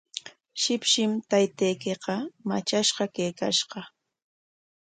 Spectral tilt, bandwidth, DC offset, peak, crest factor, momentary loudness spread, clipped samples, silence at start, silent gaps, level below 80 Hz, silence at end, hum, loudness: -3 dB/octave; 9.6 kHz; under 0.1%; -10 dBFS; 18 dB; 13 LU; under 0.1%; 0.15 s; none; -74 dBFS; 1 s; none; -26 LUFS